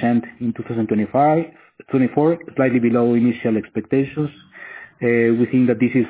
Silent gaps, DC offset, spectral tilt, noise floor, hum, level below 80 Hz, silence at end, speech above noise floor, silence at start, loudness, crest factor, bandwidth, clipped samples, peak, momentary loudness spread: none; under 0.1%; -12 dB/octave; -39 dBFS; none; -58 dBFS; 0 s; 21 dB; 0 s; -19 LUFS; 14 dB; 4 kHz; under 0.1%; -4 dBFS; 10 LU